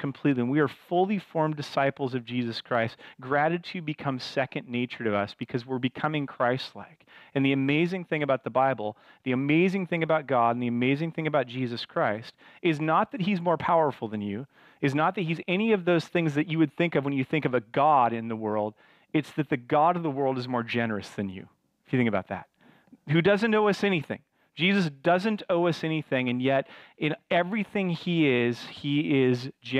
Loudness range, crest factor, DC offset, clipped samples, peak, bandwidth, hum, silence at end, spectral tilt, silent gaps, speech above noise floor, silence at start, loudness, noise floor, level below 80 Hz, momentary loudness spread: 4 LU; 16 dB; under 0.1%; under 0.1%; -12 dBFS; 12 kHz; none; 0 s; -7 dB/octave; none; 30 dB; 0 s; -27 LUFS; -57 dBFS; -70 dBFS; 9 LU